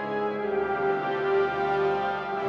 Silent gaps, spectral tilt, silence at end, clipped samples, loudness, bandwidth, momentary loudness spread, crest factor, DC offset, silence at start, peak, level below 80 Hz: none; -7 dB/octave; 0 s; under 0.1%; -27 LUFS; 6.4 kHz; 4 LU; 12 dB; under 0.1%; 0 s; -14 dBFS; -58 dBFS